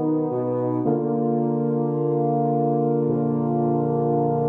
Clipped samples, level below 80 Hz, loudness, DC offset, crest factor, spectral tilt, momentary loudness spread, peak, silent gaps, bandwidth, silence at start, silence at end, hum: under 0.1%; -62 dBFS; -22 LUFS; under 0.1%; 12 dB; -13.5 dB/octave; 2 LU; -10 dBFS; none; 2.6 kHz; 0 s; 0 s; none